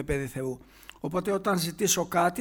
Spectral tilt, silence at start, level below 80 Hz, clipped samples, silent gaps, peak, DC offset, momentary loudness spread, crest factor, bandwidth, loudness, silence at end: -4 dB/octave; 0 s; -50 dBFS; under 0.1%; none; -10 dBFS; under 0.1%; 12 LU; 18 dB; over 20 kHz; -28 LUFS; 0 s